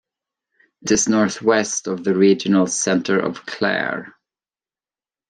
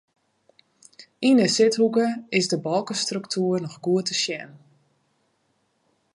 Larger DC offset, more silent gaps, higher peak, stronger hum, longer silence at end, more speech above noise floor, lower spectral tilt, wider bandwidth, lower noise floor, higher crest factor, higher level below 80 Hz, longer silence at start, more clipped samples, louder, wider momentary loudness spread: neither; neither; first, -2 dBFS vs -8 dBFS; neither; second, 1.2 s vs 1.6 s; first, over 72 dB vs 47 dB; about the same, -4 dB/octave vs -4 dB/octave; about the same, 10.5 kHz vs 11.5 kHz; first, under -90 dBFS vs -70 dBFS; about the same, 18 dB vs 18 dB; first, -60 dBFS vs -74 dBFS; second, 0.85 s vs 1 s; neither; first, -19 LUFS vs -23 LUFS; about the same, 9 LU vs 8 LU